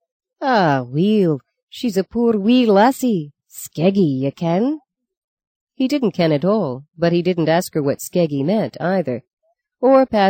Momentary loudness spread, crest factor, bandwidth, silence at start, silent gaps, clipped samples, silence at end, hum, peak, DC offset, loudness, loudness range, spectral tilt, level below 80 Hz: 12 LU; 14 dB; 17 kHz; 0.4 s; 1.63-1.68 s, 5.17-5.37 s, 5.47-5.67 s, 9.33-9.37 s; under 0.1%; 0 s; none; -4 dBFS; under 0.1%; -18 LUFS; 3 LU; -6.5 dB/octave; -58 dBFS